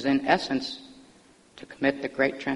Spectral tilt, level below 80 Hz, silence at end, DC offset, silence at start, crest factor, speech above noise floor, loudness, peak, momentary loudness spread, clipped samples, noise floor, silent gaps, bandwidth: -5 dB/octave; -62 dBFS; 0 s; under 0.1%; 0 s; 22 dB; 30 dB; -26 LUFS; -6 dBFS; 20 LU; under 0.1%; -56 dBFS; none; 11 kHz